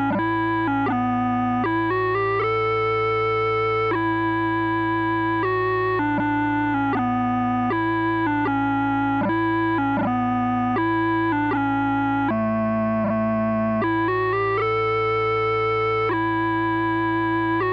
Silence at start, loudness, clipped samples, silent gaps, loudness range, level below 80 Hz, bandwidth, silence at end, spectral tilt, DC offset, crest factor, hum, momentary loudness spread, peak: 0 s; -22 LUFS; under 0.1%; none; 0 LU; -48 dBFS; 5.6 kHz; 0 s; -8.5 dB/octave; under 0.1%; 8 dB; none; 1 LU; -14 dBFS